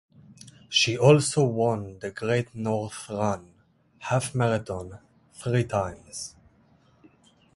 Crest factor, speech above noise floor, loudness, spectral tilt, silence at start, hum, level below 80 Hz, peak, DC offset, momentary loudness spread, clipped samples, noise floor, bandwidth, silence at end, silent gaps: 22 dB; 35 dB; -26 LUFS; -5 dB/octave; 0.45 s; none; -56 dBFS; -4 dBFS; under 0.1%; 17 LU; under 0.1%; -60 dBFS; 11.5 kHz; 1.25 s; none